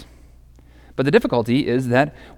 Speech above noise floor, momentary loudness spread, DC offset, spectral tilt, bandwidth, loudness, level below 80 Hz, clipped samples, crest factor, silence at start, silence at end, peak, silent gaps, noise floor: 28 dB; 5 LU; under 0.1%; -7 dB/octave; 16.5 kHz; -19 LUFS; -46 dBFS; under 0.1%; 18 dB; 0 s; 0.1 s; -2 dBFS; none; -47 dBFS